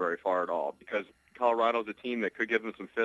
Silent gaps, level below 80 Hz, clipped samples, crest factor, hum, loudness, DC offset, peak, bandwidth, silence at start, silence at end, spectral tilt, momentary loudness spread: none; -76 dBFS; under 0.1%; 18 dB; none; -31 LUFS; under 0.1%; -12 dBFS; 11.5 kHz; 0 s; 0 s; -5.5 dB/octave; 9 LU